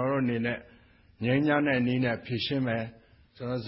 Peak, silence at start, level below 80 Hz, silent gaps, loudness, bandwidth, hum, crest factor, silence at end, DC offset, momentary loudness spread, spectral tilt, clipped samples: -14 dBFS; 0 s; -58 dBFS; none; -28 LUFS; 5.8 kHz; none; 16 dB; 0 s; under 0.1%; 11 LU; -10.5 dB/octave; under 0.1%